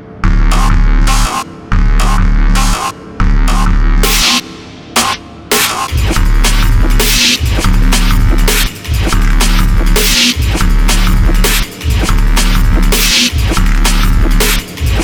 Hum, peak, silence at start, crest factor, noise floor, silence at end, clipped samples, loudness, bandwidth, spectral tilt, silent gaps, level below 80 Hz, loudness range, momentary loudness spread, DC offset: none; 0 dBFS; 0 s; 8 dB; -29 dBFS; 0 s; under 0.1%; -12 LUFS; over 20 kHz; -3.5 dB/octave; none; -10 dBFS; 2 LU; 7 LU; under 0.1%